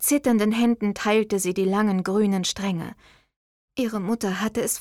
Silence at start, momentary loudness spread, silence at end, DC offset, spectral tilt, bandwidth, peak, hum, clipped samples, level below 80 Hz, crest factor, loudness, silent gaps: 0 s; 8 LU; 0 s; under 0.1%; -4.5 dB/octave; 17 kHz; -10 dBFS; none; under 0.1%; -58 dBFS; 14 dB; -23 LUFS; 3.36-3.68 s